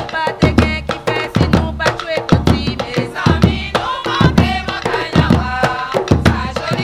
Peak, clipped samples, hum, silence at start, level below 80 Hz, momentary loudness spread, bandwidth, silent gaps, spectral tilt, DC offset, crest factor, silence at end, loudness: 0 dBFS; 0.2%; none; 0 s; -26 dBFS; 6 LU; 15 kHz; none; -6.5 dB/octave; under 0.1%; 14 dB; 0 s; -15 LUFS